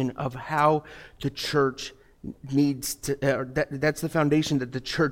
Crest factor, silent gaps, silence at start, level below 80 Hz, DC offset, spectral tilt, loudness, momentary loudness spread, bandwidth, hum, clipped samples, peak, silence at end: 18 dB; none; 0 s; -52 dBFS; under 0.1%; -5.5 dB/octave; -26 LUFS; 15 LU; 16.5 kHz; none; under 0.1%; -8 dBFS; 0 s